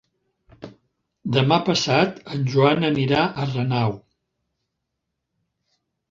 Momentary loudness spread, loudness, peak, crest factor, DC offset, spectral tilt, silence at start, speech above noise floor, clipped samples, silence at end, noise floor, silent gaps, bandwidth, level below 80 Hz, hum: 8 LU; -21 LUFS; -2 dBFS; 22 dB; under 0.1%; -6 dB/octave; 0.6 s; 59 dB; under 0.1%; 2.15 s; -79 dBFS; none; 7.6 kHz; -58 dBFS; none